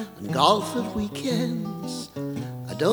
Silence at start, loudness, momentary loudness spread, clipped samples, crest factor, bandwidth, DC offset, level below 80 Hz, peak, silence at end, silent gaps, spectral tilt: 0 s; -26 LUFS; 13 LU; under 0.1%; 24 dB; over 20 kHz; under 0.1%; -54 dBFS; -2 dBFS; 0 s; none; -5 dB/octave